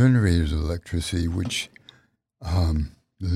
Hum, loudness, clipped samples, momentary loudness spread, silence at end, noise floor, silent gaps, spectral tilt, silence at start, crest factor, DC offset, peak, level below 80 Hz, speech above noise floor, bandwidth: none; -25 LUFS; under 0.1%; 14 LU; 0 s; -61 dBFS; none; -6 dB/octave; 0 s; 14 dB; under 0.1%; -8 dBFS; -32 dBFS; 39 dB; 13.5 kHz